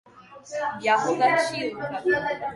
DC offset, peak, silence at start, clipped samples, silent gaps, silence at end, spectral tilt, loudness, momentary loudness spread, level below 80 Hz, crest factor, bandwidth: under 0.1%; -8 dBFS; 0.15 s; under 0.1%; none; 0 s; -4 dB/octave; -24 LUFS; 9 LU; -62 dBFS; 16 dB; 11.5 kHz